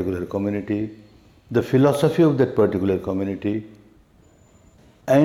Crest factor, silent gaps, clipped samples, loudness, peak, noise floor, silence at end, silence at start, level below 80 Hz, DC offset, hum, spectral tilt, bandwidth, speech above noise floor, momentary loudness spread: 16 dB; none; under 0.1%; -21 LUFS; -6 dBFS; -54 dBFS; 0 s; 0 s; -54 dBFS; under 0.1%; none; -8 dB/octave; 16 kHz; 33 dB; 10 LU